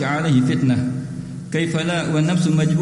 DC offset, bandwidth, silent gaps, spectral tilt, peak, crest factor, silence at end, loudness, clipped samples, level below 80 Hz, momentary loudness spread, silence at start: under 0.1%; 11.5 kHz; none; -6.5 dB/octave; -6 dBFS; 14 dB; 0 s; -19 LUFS; under 0.1%; -52 dBFS; 10 LU; 0 s